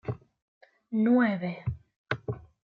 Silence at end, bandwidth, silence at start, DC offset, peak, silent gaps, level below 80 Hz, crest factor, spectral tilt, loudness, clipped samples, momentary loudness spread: 0.3 s; 5 kHz; 0.05 s; under 0.1%; -14 dBFS; 0.42-0.61 s, 1.96-2.06 s; -58 dBFS; 18 dB; -9 dB/octave; -29 LUFS; under 0.1%; 19 LU